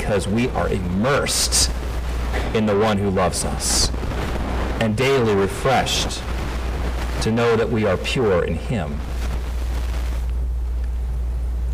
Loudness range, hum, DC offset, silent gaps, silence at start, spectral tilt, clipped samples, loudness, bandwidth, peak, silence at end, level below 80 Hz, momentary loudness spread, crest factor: 4 LU; none; under 0.1%; none; 0 s; -4.5 dB/octave; under 0.1%; -21 LUFS; 16 kHz; -8 dBFS; 0 s; -26 dBFS; 8 LU; 14 dB